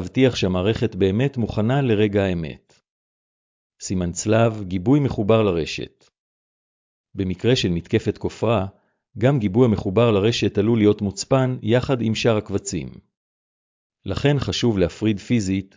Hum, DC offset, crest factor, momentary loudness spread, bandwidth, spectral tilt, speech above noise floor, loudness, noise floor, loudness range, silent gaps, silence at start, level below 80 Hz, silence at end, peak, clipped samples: none; under 0.1%; 16 dB; 10 LU; 7.6 kHz; -6.5 dB/octave; over 70 dB; -21 LUFS; under -90 dBFS; 4 LU; 2.90-3.70 s, 6.19-7.04 s, 13.17-13.90 s; 0 s; -42 dBFS; 0.1 s; -4 dBFS; under 0.1%